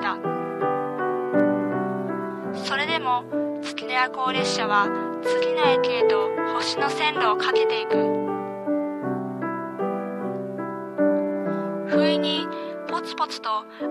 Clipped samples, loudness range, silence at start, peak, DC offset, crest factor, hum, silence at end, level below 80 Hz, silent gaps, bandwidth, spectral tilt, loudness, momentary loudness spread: under 0.1%; 5 LU; 0 s; -6 dBFS; under 0.1%; 18 dB; none; 0 s; -74 dBFS; none; 12.5 kHz; -5 dB/octave; -24 LUFS; 9 LU